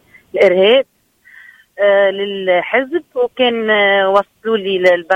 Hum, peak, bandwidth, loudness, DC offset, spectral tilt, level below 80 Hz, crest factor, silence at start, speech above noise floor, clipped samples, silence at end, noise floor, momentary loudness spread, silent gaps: none; 0 dBFS; 8.4 kHz; -14 LUFS; under 0.1%; -5.5 dB/octave; -60 dBFS; 14 dB; 0.35 s; 31 dB; under 0.1%; 0 s; -45 dBFS; 8 LU; none